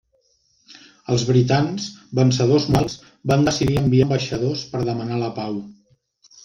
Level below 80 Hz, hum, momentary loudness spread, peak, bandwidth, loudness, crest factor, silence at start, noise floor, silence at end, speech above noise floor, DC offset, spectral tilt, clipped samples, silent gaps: -46 dBFS; none; 11 LU; -4 dBFS; 9.4 kHz; -20 LUFS; 18 dB; 0.7 s; -64 dBFS; 0.75 s; 45 dB; under 0.1%; -6 dB/octave; under 0.1%; none